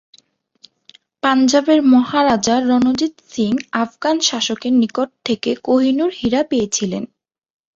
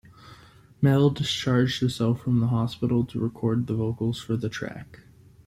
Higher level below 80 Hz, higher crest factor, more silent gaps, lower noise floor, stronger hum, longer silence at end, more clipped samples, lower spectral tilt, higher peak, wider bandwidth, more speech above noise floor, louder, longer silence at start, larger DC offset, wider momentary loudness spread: about the same, -54 dBFS vs -54 dBFS; about the same, 16 dB vs 16 dB; neither; about the same, -54 dBFS vs -51 dBFS; neither; first, 0.7 s vs 0.5 s; neither; second, -3.5 dB/octave vs -6.5 dB/octave; first, -2 dBFS vs -8 dBFS; second, 7.8 kHz vs 13.5 kHz; first, 38 dB vs 27 dB; first, -16 LUFS vs -25 LUFS; first, 1.25 s vs 0.25 s; neither; about the same, 9 LU vs 8 LU